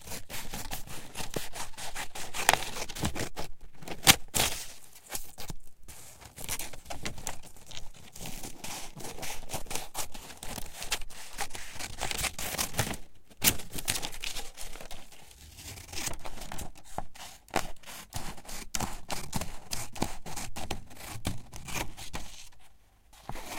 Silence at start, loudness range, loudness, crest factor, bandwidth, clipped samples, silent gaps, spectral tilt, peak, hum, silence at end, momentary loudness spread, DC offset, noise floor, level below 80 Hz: 0 s; 12 LU; -34 LUFS; 32 dB; 17 kHz; under 0.1%; none; -2 dB/octave; -2 dBFS; none; 0 s; 19 LU; under 0.1%; -56 dBFS; -46 dBFS